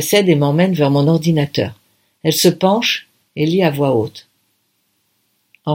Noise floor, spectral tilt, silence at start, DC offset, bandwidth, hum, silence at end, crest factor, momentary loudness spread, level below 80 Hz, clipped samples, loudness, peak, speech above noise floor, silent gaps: -65 dBFS; -5.5 dB/octave; 0 s; under 0.1%; 17 kHz; none; 0 s; 16 dB; 9 LU; -58 dBFS; under 0.1%; -15 LUFS; 0 dBFS; 50 dB; none